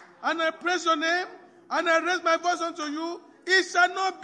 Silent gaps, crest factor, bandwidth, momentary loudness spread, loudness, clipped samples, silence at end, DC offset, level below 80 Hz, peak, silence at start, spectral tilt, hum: none; 18 dB; 10.5 kHz; 10 LU; -25 LUFS; under 0.1%; 0 s; under 0.1%; -86 dBFS; -8 dBFS; 0 s; -0.5 dB/octave; none